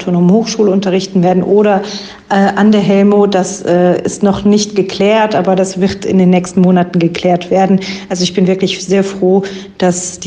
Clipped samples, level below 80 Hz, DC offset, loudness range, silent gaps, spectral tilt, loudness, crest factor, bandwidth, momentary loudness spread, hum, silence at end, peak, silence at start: under 0.1%; -46 dBFS; under 0.1%; 1 LU; none; -6 dB/octave; -11 LUFS; 10 dB; 9.6 kHz; 6 LU; none; 0 s; 0 dBFS; 0 s